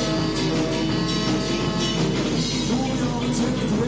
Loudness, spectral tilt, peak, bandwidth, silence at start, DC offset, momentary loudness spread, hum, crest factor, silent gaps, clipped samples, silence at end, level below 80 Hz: -23 LUFS; -5 dB/octave; -10 dBFS; 8 kHz; 0 s; under 0.1%; 1 LU; none; 12 dB; none; under 0.1%; 0 s; -38 dBFS